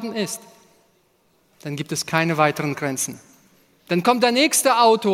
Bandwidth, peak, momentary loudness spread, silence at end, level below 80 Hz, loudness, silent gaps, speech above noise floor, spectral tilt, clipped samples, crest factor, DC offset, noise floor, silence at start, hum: 16.5 kHz; -2 dBFS; 14 LU; 0 s; -68 dBFS; -20 LUFS; none; 42 dB; -3.5 dB/octave; under 0.1%; 20 dB; under 0.1%; -62 dBFS; 0 s; none